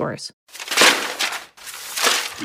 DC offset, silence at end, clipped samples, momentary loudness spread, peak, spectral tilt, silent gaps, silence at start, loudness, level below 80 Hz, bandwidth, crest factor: under 0.1%; 0 s; under 0.1%; 20 LU; 0 dBFS; -0.5 dB/octave; 0.33-0.47 s; 0 s; -18 LUFS; -68 dBFS; 16 kHz; 20 dB